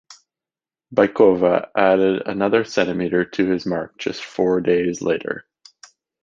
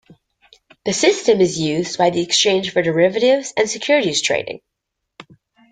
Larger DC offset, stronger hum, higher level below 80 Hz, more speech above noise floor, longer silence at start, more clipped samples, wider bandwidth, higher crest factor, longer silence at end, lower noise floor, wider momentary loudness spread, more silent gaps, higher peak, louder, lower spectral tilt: neither; neither; about the same, -56 dBFS vs -60 dBFS; first, over 71 dB vs 61 dB; second, 0.1 s vs 0.85 s; neither; second, 7.6 kHz vs 9.6 kHz; about the same, 18 dB vs 18 dB; first, 0.8 s vs 0.5 s; first, under -90 dBFS vs -78 dBFS; first, 11 LU vs 8 LU; neither; about the same, -2 dBFS vs -2 dBFS; about the same, -19 LUFS vs -17 LUFS; first, -6 dB/octave vs -3.5 dB/octave